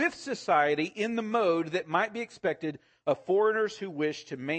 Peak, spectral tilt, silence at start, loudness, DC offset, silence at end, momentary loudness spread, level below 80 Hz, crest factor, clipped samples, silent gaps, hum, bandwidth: -12 dBFS; -5 dB/octave; 0 s; -29 LUFS; under 0.1%; 0 s; 10 LU; -76 dBFS; 18 dB; under 0.1%; none; none; 8.8 kHz